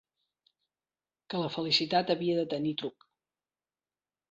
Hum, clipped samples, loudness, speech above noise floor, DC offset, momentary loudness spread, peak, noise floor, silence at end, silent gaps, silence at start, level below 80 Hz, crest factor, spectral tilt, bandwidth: none; under 0.1%; -30 LUFS; over 60 dB; under 0.1%; 12 LU; -12 dBFS; under -90 dBFS; 1.4 s; none; 1.3 s; -76 dBFS; 22 dB; -5.5 dB/octave; 7.8 kHz